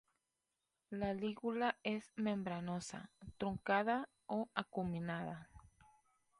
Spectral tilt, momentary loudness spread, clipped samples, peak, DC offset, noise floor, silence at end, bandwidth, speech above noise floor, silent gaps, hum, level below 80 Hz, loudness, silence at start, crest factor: -6 dB/octave; 12 LU; under 0.1%; -20 dBFS; under 0.1%; -89 dBFS; 0.8 s; 11.5 kHz; 48 dB; none; none; -68 dBFS; -41 LUFS; 0.9 s; 24 dB